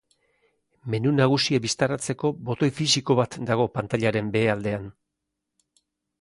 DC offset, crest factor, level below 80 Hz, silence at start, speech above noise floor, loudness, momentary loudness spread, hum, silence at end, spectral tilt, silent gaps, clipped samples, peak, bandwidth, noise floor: under 0.1%; 18 dB; -58 dBFS; 0.85 s; 59 dB; -24 LUFS; 9 LU; none; 1.3 s; -5 dB/octave; none; under 0.1%; -6 dBFS; 11.5 kHz; -82 dBFS